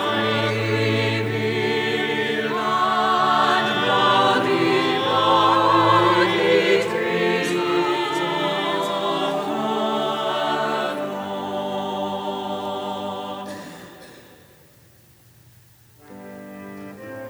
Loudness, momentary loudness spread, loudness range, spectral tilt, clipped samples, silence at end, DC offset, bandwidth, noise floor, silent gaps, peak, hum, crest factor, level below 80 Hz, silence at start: -20 LUFS; 15 LU; 13 LU; -5 dB/octave; under 0.1%; 0 s; under 0.1%; over 20 kHz; -52 dBFS; none; -4 dBFS; none; 18 dB; -66 dBFS; 0 s